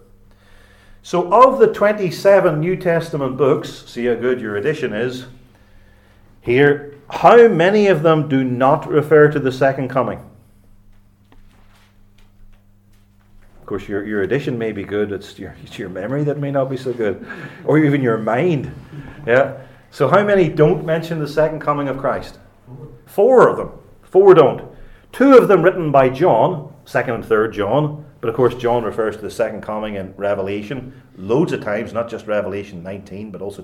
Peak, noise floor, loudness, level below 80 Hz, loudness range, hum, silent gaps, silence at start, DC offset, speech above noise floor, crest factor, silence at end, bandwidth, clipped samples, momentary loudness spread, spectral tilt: 0 dBFS; -50 dBFS; -16 LUFS; -48 dBFS; 11 LU; none; none; 1.05 s; under 0.1%; 35 dB; 16 dB; 0 s; 14.5 kHz; under 0.1%; 18 LU; -7.5 dB/octave